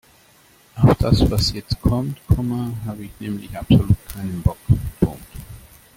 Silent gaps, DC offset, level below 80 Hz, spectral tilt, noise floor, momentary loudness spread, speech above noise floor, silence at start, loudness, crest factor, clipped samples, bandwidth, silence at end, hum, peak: none; under 0.1%; -32 dBFS; -7 dB/octave; -53 dBFS; 15 LU; 33 dB; 0.75 s; -20 LUFS; 18 dB; under 0.1%; 17 kHz; 0.35 s; none; -2 dBFS